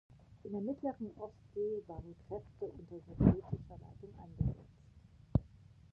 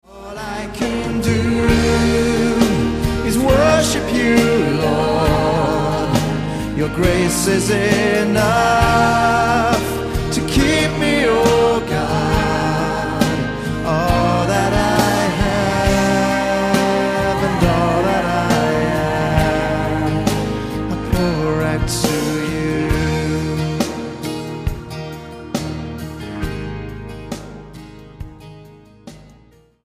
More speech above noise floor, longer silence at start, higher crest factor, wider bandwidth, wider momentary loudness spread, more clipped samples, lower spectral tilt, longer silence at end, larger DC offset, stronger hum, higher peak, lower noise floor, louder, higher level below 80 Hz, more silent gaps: second, 22 dB vs 35 dB; first, 0.3 s vs 0.1 s; first, 26 dB vs 16 dB; second, 5.4 kHz vs 15.5 kHz; first, 22 LU vs 13 LU; neither; first, -12 dB/octave vs -5.5 dB/octave; second, 0.45 s vs 0.6 s; neither; neither; second, -12 dBFS vs 0 dBFS; first, -61 dBFS vs -49 dBFS; second, -39 LUFS vs -17 LUFS; second, -50 dBFS vs -30 dBFS; neither